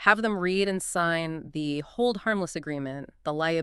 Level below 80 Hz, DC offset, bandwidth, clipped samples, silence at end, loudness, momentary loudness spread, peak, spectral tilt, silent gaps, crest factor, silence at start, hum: -58 dBFS; under 0.1%; 13 kHz; under 0.1%; 0 s; -28 LUFS; 8 LU; -4 dBFS; -4.5 dB/octave; none; 22 dB; 0 s; none